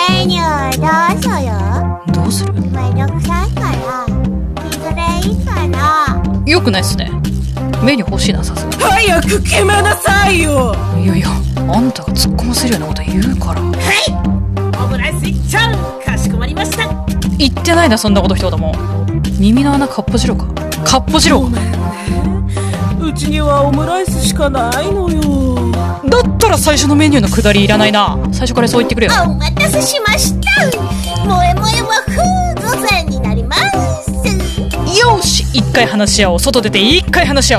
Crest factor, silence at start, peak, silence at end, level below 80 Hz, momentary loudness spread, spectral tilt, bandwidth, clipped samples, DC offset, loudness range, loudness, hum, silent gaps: 12 dB; 0 s; 0 dBFS; 0 s; -20 dBFS; 7 LU; -4.5 dB/octave; 14.5 kHz; under 0.1%; under 0.1%; 4 LU; -12 LUFS; none; none